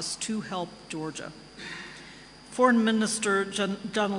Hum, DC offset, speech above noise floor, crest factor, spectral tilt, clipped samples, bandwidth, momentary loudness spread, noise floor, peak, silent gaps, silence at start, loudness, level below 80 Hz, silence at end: none; under 0.1%; 20 dB; 20 dB; -3.5 dB/octave; under 0.1%; 11 kHz; 20 LU; -48 dBFS; -8 dBFS; none; 0 s; -27 LUFS; -64 dBFS; 0 s